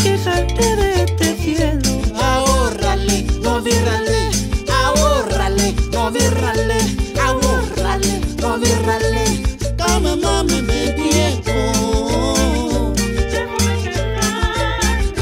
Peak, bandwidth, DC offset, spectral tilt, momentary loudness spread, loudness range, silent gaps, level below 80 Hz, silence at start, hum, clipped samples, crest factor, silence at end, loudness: -4 dBFS; 16.5 kHz; under 0.1%; -4.5 dB/octave; 3 LU; 1 LU; none; -22 dBFS; 0 s; none; under 0.1%; 12 dB; 0 s; -17 LUFS